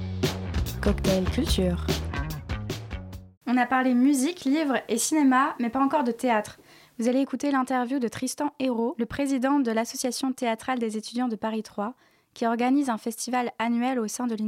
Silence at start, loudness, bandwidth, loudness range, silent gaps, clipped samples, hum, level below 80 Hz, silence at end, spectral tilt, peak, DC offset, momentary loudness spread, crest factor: 0 s; -26 LUFS; 17 kHz; 4 LU; 3.37-3.41 s; under 0.1%; none; -40 dBFS; 0 s; -5 dB/octave; -10 dBFS; under 0.1%; 11 LU; 16 dB